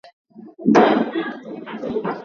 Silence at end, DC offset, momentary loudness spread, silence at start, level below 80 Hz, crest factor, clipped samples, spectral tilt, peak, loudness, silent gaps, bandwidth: 0 s; under 0.1%; 17 LU; 0.05 s; -64 dBFS; 20 dB; under 0.1%; -6.5 dB/octave; 0 dBFS; -19 LUFS; 0.13-0.25 s; 7 kHz